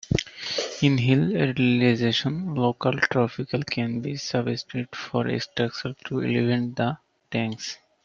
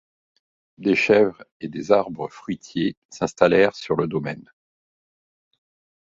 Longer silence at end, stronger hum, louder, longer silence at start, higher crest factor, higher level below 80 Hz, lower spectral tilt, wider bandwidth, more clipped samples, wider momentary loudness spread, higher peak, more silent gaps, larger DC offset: second, 0.3 s vs 1.6 s; neither; second, -25 LUFS vs -21 LUFS; second, 0.1 s vs 0.8 s; about the same, 20 dB vs 22 dB; about the same, -54 dBFS vs -58 dBFS; about the same, -6 dB/octave vs -6 dB/octave; about the same, 7.6 kHz vs 7.8 kHz; neither; second, 9 LU vs 16 LU; second, -6 dBFS vs -2 dBFS; second, none vs 1.51-1.60 s, 2.97-3.09 s; neither